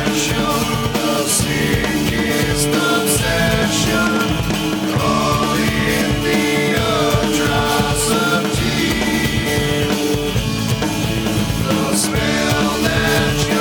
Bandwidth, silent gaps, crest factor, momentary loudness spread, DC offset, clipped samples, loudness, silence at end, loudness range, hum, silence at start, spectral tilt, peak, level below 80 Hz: over 20 kHz; none; 14 dB; 3 LU; under 0.1%; under 0.1%; -16 LUFS; 0 s; 2 LU; none; 0 s; -4 dB/octave; -2 dBFS; -32 dBFS